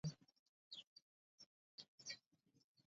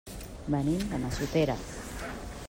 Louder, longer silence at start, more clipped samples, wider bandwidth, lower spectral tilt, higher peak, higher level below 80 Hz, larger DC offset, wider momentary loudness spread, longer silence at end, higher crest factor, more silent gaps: second, -57 LUFS vs -32 LUFS; about the same, 0.05 s vs 0.05 s; neither; second, 7.4 kHz vs 16 kHz; second, -4.5 dB/octave vs -6 dB/octave; second, -36 dBFS vs -14 dBFS; second, -84 dBFS vs -44 dBFS; neither; about the same, 14 LU vs 12 LU; about the same, 0.05 s vs 0 s; about the same, 22 dB vs 18 dB; first, 0.39-0.71 s, 0.87-0.96 s, 1.02-1.38 s, 1.46-1.78 s, 1.88-1.98 s, 2.26-2.31 s, 2.64-2.75 s vs none